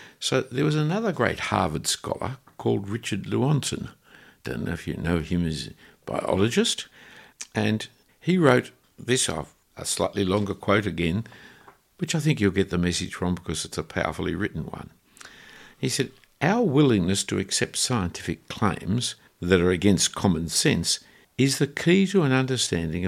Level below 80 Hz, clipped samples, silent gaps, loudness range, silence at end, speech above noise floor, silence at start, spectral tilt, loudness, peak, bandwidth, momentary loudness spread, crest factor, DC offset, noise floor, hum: -50 dBFS; under 0.1%; none; 6 LU; 0 s; 29 dB; 0 s; -4.5 dB/octave; -25 LUFS; -2 dBFS; 16 kHz; 14 LU; 22 dB; under 0.1%; -53 dBFS; none